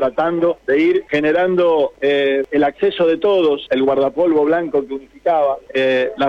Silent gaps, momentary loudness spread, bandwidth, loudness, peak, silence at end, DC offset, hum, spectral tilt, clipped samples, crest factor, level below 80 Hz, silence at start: none; 4 LU; 7.2 kHz; -16 LUFS; -8 dBFS; 0 s; under 0.1%; none; -7 dB/octave; under 0.1%; 8 dB; -54 dBFS; 0 s